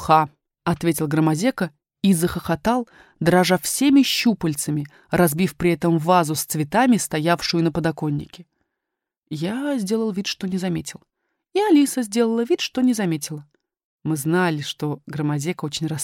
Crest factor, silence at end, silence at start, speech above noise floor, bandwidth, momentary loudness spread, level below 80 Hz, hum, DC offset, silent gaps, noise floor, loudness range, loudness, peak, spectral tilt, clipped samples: 20 dB; 0 s; 0 s; 63 dB; 17 kHz; 11 LU; -52 dBFS; none; under 0.1%; 9.18-9.22 s, 13.84-13.99 s; -84 dBFS; 6 LU; -21 LUFS; -2 dBFS; -5 dB/octave; under 0.1%